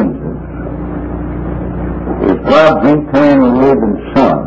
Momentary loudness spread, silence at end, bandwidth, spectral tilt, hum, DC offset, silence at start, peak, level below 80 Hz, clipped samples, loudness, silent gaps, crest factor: 14 LU; 0 s; 8 kHz; -8 dB/octave; none; under 0.1%; 0 s; 0 dBFS; -26 dBFS; 0.7%; -12 LUFS; none; 12 dB